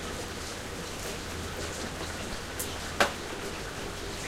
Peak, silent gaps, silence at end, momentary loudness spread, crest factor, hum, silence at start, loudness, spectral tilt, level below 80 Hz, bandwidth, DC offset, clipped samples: -8 dBFS; none; 0 s; 9 LU; 28 dB; none; 0 s; -34 LUFS; -3 dB/octave; -46 dBFS; 16 kHz; under 0.1%; under 0.1%